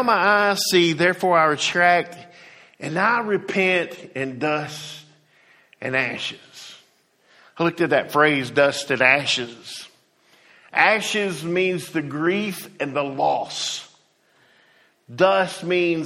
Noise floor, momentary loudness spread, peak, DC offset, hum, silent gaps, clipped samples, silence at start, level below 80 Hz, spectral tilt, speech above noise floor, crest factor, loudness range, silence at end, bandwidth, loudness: -60 dBFS; 17 LU; -2 dBFS; under 0.1%; none; none; under 0.1%; 0 s; -68 dBFS; -4 dB/octave; 40 dB; 20 dB; 7 LU; 0 s; 16 kHz; -20 LUFS